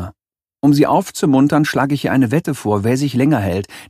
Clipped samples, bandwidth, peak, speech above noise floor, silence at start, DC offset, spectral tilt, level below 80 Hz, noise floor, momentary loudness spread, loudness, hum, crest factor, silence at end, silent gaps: under 0.1%; 15 kHz; -2 dBFS; 68 dB; 0 s; under 0.1%; -6.5 dB/octave; -50 dBFS; -83 dBFS; 5 LU; -16 LUFS; none; 14 dB; 0.05 s; none